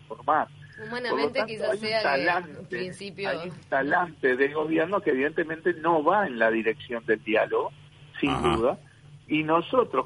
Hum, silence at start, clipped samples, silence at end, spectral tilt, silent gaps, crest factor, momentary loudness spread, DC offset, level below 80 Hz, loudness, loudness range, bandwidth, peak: none; 0.1 s; under 0.1%; 0 s; -6 dB/octave; none; 18 dB; 10 LU; under 0.1%; -54 dBFS; -26 LUFS; 3 LU; 10.5 kHz; -8 dBFS